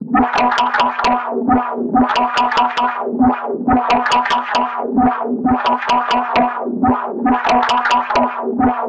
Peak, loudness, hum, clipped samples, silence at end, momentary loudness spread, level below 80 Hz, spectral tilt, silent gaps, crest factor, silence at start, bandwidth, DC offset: -4 dBFS; -15 LUFS; none; under 0.1%; 0 s; 4 LU; -42 dBFS; -5 dB/octave; none; 10 dB; 0 s; 9.2 kHz; under 0.1%